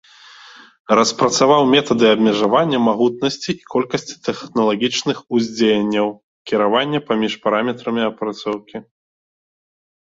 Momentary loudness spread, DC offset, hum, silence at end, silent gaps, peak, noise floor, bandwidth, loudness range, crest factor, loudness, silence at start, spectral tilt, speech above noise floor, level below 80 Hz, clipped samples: 11 LU; under 0.1%; none; 1.25 s; 6.23-6.45 s; -2 dBFS; -43 dBFS; 7.8 kHz; 5 LU; 16 dB; -17 LUFS; 0.9 s; -4.5 dB/octave; 26 dB; -60 dBFS; under 0.1%